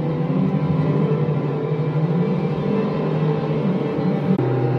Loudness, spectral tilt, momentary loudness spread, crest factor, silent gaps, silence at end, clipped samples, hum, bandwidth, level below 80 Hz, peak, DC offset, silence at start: -21 LUFS; -10.5 dB/octave; 2 LU; 12 dB; none; 0 s; under 0.1%; none; 5.6 kHz; -52 dBFS; -8 dBFS; under 0.1%; 0 s